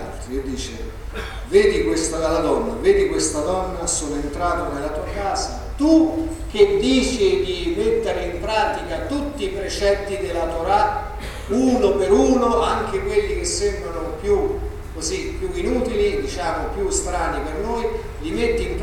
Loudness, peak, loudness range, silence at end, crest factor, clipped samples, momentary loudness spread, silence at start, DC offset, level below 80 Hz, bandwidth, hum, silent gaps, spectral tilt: -21 LUFS; -2 dBFS; 4 LU; 0 s; 18 dB; under 0.1%; 11 LU; 0 s; under 0.1%; -32 dBFS; 15.5 kHz; none; none; -4.5 dB/octave